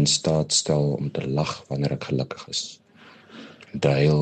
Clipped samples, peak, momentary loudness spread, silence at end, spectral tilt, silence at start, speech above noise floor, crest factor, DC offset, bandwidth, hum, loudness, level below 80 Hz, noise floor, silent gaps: under 0.1%; -6 dBFS; 17 LU; 0 s; -4.5 dB/octave; 0 s; 27 dB; 18 dB; under 0.1%; 9.4 kHz; none; -24 LUFS; -52 dBFS; -50 dBFS; none